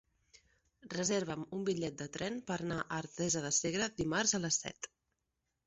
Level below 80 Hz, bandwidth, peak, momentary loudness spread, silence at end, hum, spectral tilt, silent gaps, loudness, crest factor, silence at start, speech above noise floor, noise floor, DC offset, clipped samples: -68 dBFS; 8 kHz; -18 dBFS; 9 LU; 0.8 s; none; -4 dB/octave; none; -36 LUFS; 20 dB; 0.85 s; 49 dB; -86 dBFS; under 0.1%; under 0.1%